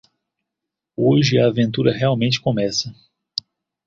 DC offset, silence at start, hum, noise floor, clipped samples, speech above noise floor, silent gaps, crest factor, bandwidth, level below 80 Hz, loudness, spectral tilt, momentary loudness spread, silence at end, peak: under 0.1%; 1 s; none; -83 dBFS; under 0.1%; 66 dB; none; 18 dB; 7.6 kHz; -54 dBFS; -19 LUFS; -5.5 dB/octave; 14 LU; 0.95 s; -2 dBFS